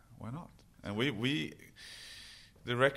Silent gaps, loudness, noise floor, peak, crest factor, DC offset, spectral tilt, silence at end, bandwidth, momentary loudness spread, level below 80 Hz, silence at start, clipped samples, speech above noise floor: none; -37 LUFS; -54 dBFS; -14 dBFS; 24 dB; under 0.1%; -5.5 dB/octave; 0 s; 16 kHz; 18 LU; -64 dBFS; 0.1 s; under 0.1%; 19 dB